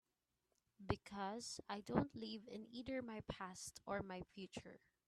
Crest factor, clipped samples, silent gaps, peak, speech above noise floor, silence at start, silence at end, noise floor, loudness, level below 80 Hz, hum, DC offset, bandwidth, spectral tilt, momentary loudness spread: 28 dB; under 0.1%; none; -20 dBFS; 41 dB; 0.8 s; 0.3 s; -88 dBFS; -48 LUFS; -68 dBFS; none; under 0.1%; 13 kHz; -5 dB/octave; 11 LU